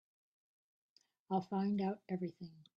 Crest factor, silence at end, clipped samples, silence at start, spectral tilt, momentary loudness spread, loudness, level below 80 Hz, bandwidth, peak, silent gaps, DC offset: 20 dB; 0.15 s; under 0.1%; 1.3 s; -9.5 dB/octave; 9 LU; -40 LUFS; -82 dBFS; 6.4 kHz; -22 dBFS; none; under 0.1%